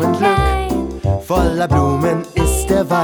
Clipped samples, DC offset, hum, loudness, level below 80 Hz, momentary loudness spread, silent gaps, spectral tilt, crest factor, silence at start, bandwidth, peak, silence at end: under 0.1%; under 0.1%; none; -16 LUFS; -24 dBFS; 6 LU; none; -6 dB/octave; 14 dB; 0 s; over 20 kHz; 0 dBFS; 0 s